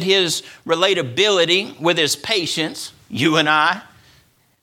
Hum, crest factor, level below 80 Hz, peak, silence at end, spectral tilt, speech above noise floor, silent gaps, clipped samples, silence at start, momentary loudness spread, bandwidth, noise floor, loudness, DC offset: none; 18 dB; -64 dBFS; 0 dBFS; 0.8 s; -3 dB/octave; 38 dB; none; under 0.1%; 0 s; 10 LU; 16.5 kHz; -56 dBFS; -17 LUFS; under 0.1%